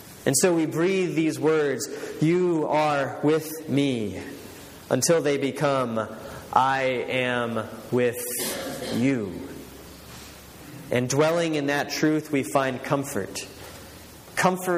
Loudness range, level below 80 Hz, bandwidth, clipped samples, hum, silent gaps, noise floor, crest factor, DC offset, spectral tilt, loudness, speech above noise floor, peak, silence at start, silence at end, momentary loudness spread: 4 LU; -58 dBFS; 15.5 kHz; under 0.1%; none; none; -44 dBFS; 22 dB; under 0.1%; -4.5 dB/octave; -24 LUFS; 21 dB; -4 dBFS; 0 s; 0 s; 20 LU